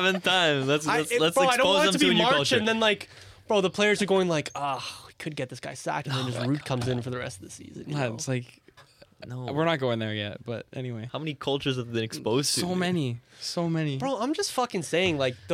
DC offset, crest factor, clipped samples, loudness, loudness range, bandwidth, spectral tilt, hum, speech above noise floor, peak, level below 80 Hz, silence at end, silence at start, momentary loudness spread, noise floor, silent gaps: under 0.1%; 16 dB; under 0.1%; -26 LUFS; 9 LU; 16.5 kHz; -4 dB/octave; none; 29 dB; -10 dBFS; -62 dBFS; 0 s; 0 s; 14 LU; -55 dBFS; none